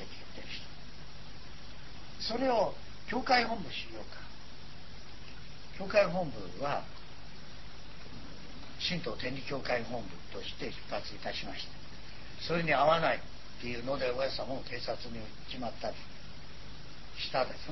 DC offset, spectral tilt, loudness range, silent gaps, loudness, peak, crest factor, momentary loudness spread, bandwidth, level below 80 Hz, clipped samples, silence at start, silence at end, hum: 1%; -5 dB/octave; 6 LU; none; -34 LUFS; -14 dBFS; 24 dB; 21 LU; 6.2 kHz; -54 dBFS; under 0.1%; 0 s; 0 s; none